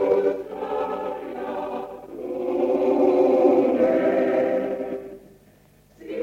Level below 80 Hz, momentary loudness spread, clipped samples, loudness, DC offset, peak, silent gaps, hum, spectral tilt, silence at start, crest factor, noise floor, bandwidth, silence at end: -62 dBFS; 15 LU; under 0.1%; -22 LUFS; under 0.1%; -4 dBFS; none; 50 Hz at -60 dBFS; -7.5 dB/octave; 0 s; 18 dB; -55 dBFS; 7 kHz; 0 s